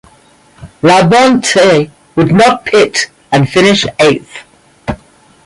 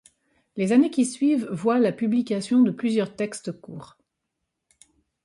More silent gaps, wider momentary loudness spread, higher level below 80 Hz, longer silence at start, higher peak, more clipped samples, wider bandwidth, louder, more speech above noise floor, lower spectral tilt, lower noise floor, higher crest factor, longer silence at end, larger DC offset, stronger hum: neither; about the same, 15 LU vs 17 LU; first, -40 dBFS vs -70 dBFS; about the same, 0.6 s vs 0.55 s; first, 0 dBFS vs -8 dBFS; neither; about the same, 11.5 kHz vs 11.5 kHz; first, -9 LUFS vs -23 LUFS; second, 37 dB vs 58 dB; second, -4.5 dB/octave vs -6 dB/octave; second, -45 dBFS vs -81 dBFS; second, 10 dB vs 16 dB; second, 0.5 s vs 1.4 s; neither; neither